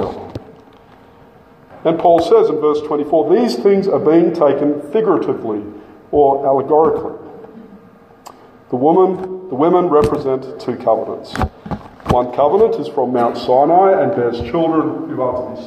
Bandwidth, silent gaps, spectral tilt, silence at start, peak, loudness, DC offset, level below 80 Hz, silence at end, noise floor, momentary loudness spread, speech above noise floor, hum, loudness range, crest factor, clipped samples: 9.8 kHz; none; -7.5 dB/octave; 0 s; 0 dBFS; -15 LUFS; under 0.1%; -42 dBFS; 0 s; -44 dBFS; 13 LU; 30 dB; none; 4 LU; 14 dB; under 0.1%